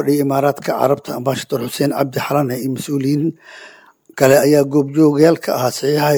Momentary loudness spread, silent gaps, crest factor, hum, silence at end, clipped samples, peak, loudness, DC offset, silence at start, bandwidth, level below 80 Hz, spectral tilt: 9 LU; none; 16 dB; none; 0 s; under 0.1%; 0 dBFS; -16 LUFS; under 0.1%; 0 s; over 20 kHz; -60 dBFS; -6 dB/octave